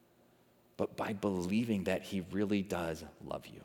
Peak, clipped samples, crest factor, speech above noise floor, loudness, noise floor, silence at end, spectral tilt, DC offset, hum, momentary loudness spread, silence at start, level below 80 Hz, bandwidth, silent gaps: -20 dBFS; under 0.1%; 16 dB; 31 dB; -36 LUFS; -67 dBFS; 0 s; -6.5 dB/octave; under 0.1%; none; 11 LU; 0.8 s; -68 dBFS; 18.5 kHz; none